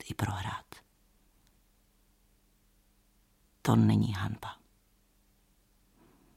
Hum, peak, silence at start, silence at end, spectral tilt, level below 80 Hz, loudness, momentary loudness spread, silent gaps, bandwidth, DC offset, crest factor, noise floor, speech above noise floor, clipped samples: none; -12 dBFS; 0.05 s; 1.85 s; -7 dB/octave; -62 dBFS; -31 LUFS; 29 LU; none; 15.5 kHz; under 0.1%; 22 dB; -68 dBFS; 39 dB; under 0.1%